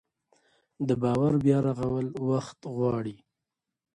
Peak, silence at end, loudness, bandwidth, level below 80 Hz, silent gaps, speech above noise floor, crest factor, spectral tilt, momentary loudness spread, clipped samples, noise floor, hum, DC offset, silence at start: -10 dBFS; 0.8 s; -28 LUFS; 11 kHz; -58 dBFS; none; 60 dB; 18 dB; -8.5 dB/octave; 10 LU; under 0.1%; -87 dBFS; none; under 0.1%; 0.8 s